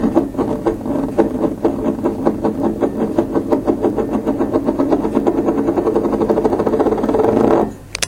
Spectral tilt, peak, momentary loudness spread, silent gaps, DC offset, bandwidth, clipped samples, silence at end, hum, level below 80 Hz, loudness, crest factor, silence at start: -6.5 dB/octave; 0 dBFS; 4 LU; none; under 0.1%; 16.5 kHz; under 0.1%; 0 s; none; -38 dBFS; -17 LUFS; 16 dB; 0 s